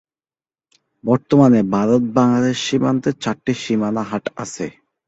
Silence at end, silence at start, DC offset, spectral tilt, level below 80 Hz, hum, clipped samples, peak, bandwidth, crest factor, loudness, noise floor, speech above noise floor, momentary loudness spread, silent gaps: 0.35 s; 1.05 s; under 0.1%; -6 dB/octave; -56 dBFS; none; under 0.1%; -2 dBFS; 8 kHz; 16 dB; -18 LUFS; under -90 dBFS; over 73 dB; 14 LU; none